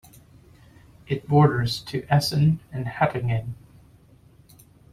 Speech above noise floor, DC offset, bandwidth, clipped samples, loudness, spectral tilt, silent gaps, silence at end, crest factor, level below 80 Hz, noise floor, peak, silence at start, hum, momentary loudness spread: 32 dB; under 0.1%; 15 kHz; under 0.1%; -23 LUFS; -6.5 dB/octave; none; 1.4 s; 20 dB; -52 dBFS; -54 dBFS; -4 dBFS; 1.1 s; none; 13 LU